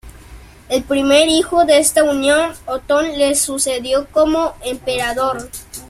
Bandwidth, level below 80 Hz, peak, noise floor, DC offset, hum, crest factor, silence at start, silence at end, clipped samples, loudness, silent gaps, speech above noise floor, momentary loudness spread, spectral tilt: 15.5 kHz; -42 dBFS; 0 dBFS; -39 dBFS; under 0.1%; none; 16 dB; 0.05 s; 0.05 s; under 0.1%; -15 LUFS; none; 23 dB; 10 LU; -2 dB/octave